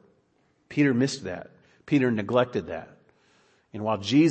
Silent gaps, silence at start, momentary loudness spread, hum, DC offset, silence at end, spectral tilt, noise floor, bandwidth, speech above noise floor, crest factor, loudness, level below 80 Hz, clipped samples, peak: none; 0.7 s; 15 LU; none; under 0.1%; 0 s; -6 dB/octave; -67 dBFS; 8.6 kHz; 43 dB; 18 dB; -26 LUFS; -66 dBFS; under 0.1%; -8 dBFS